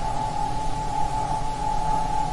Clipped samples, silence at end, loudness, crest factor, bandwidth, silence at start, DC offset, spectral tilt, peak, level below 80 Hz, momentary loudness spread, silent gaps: under 0.1%; 0 s; -27 LUFS; 12 dB; 11.5 kHz; 0 s; under 0.1%; -5 dB/octave; -12 dBFS; -32 dBFS; 3 LU; none